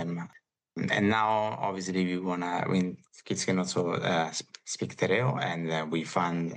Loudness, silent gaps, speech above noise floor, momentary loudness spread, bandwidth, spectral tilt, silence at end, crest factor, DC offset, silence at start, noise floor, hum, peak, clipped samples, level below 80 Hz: -30 LUFS; none; 30 dB; 10 LU; 10 kHz; -5 dB/octave; 0 s; 20 dB; under 0.1%; 0 s; -60 dBFS; none; -10 dBFS; under 0.1%; -76 dBFS